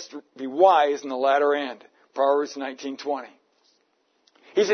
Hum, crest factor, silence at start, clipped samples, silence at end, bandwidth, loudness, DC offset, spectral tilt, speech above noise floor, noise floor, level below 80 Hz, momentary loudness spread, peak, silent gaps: none; 20 dB; 0 s; under 0.1%; 0 s; 6.6 kHz; -23 LUFS; under 0.1%; -3.5 dB/octave; 46 dB; -69 dBFS; -88 dBFS; 17 LU; -4 dBFS; none